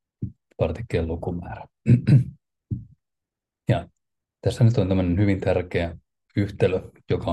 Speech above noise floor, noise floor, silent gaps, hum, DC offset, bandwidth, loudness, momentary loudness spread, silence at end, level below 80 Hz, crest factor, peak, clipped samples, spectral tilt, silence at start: 64 dB; -86 dBFS; none; none; under 0.1%; 9.6 kHz; -24 LUFS; 15 LU; 0 s; -48 dBFS; 18 dB; -6 dBFS; under 0.1%; -8.5 dB/octave; 0.2 s